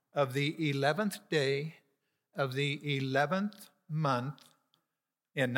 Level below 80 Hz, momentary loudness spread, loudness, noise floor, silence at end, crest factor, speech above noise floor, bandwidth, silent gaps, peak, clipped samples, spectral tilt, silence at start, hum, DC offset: -86 dBFS; 11 LU; -33 LUFS; -89 dBFS; 0 s; 20 dB; 57 dB; 17 kHz; none; -12 dBFS; under 0.1%; -6 dB/octave; 0.15 s; none; under 0.1%